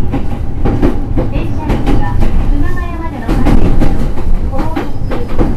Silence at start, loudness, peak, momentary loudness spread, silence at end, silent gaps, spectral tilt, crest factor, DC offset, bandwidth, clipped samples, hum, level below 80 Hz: 0 s; -16 LUFS; 0 dBFS; 7 LU; 0 s; none; -8 dB/octave; 8 dB; under 0.1%; 5.4 kHz; 0.9%; none; -12 dBFS